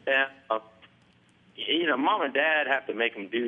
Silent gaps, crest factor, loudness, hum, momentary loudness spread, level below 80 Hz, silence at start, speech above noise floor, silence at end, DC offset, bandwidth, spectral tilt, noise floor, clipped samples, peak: none; 18 dB; -26 LUFS; none; 9 LU; -80 dBFS; 0.05 s; 34 dB; 0 s; under 0.1%; 7.2 kHz; -5.5 dB/octave; -61 dBFS; under 0.1%; -10 dBFS